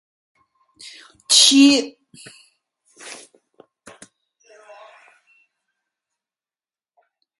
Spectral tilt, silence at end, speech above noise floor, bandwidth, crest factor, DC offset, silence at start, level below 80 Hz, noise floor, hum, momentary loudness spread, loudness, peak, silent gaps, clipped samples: 0 dB/octave; 4.25 s; over 74 dB; 11.5 kHz; 24 dB; under 0.1%; 1.3 s; -76 dBFS; under -90 dBFS; none; 29 LU; -12 LUFS; 0 dBFS; none; under 0.1%